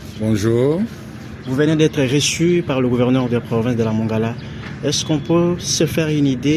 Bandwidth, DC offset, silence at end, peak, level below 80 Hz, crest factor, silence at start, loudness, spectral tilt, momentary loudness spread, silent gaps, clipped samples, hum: 14.5 kHz; under 0.1%; 0 s; -2 dBFS; -44 dBFS; 16 dB; 0 s; -18 LUFS; -5.5 dB/octave; 9 LU; none; under 0.1%; none